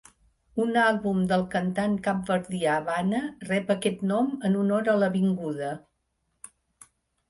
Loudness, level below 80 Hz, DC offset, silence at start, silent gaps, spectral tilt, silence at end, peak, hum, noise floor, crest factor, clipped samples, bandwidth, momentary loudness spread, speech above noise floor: -26 LUFS; -62 dBFS; under 0.1%; 0.55 s; none; -6.5 dB/octave; 1.5 s; -10 dBFS; none; -76 dBFS; 16 dB; under 0.1%; 11.5 kHz; 7 LU; 50 dB